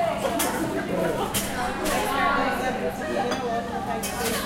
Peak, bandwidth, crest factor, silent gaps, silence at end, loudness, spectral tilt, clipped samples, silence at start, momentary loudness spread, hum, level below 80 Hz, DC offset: -8 dBFS; 16 kHz; 18 dB; none; 0 s; -26 LUFS; -3.5 dB/octave; under 0.1%; 0 s; 6 LU; none; -44 dBFS; under 0.1%